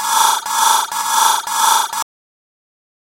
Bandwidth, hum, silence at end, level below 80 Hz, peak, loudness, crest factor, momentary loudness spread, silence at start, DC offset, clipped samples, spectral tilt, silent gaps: 16.5 kHz; none; 1.05 s; -70 dBFS; 0 dBFS; -14 LUFS; 18 dB; 8 LU; 0 s; under 0.1%; under 0.1%; 3 dB/octave; none